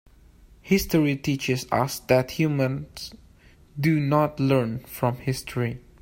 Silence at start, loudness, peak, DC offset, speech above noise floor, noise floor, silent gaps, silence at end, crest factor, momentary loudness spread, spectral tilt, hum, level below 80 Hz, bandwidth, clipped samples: 0.65 s; -24 LUFS; -6 dBFS; under 0.1%; 29 dB; -53 dBFS; none; 0.2 s; 20 dB; 10 LU; -6 dB/octave; none; -48 dBFS; 16.5 kHz; under 0.1%